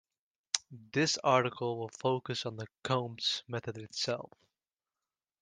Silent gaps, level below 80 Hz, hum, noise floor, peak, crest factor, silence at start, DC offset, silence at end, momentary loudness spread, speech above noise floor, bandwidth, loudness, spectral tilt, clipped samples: none; -76 dBFS; none; under -90 dBFS; -8 dBFS; 28 dB; 0.55 s; under 0.1%; 1.15 s; 12 LU; over 56 dB; 10.5 kHz; -34 LUFS; -3.5 dB/octave; under 0.1%